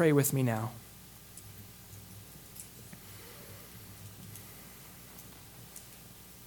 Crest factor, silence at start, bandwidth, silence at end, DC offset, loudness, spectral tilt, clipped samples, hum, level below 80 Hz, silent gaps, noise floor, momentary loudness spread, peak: 22 dB; 0 s; 19 kHz; 0 s; under 0.1%; -38 LUFS; -5.5 dB/octave; under 0.1%; 60 Hz at -60 dBFS; -64 dBFS; none; -52 dBFS; 18 LU; -14 dBFS